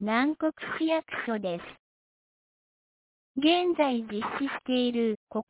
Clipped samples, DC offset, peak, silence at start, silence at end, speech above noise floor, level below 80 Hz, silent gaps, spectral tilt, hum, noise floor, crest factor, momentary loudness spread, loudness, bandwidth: under 0.1%; under 0.1%; -12 dBFS; 0 s; 0.1 s; over 62 dB; -70 dBFS; 1.79-3.35 s, 5.16-5.27 s; -2.5 dB/octave; none; under -90 dBFS; 18 dB; 9 LU; -28 LUFS; 4 kHz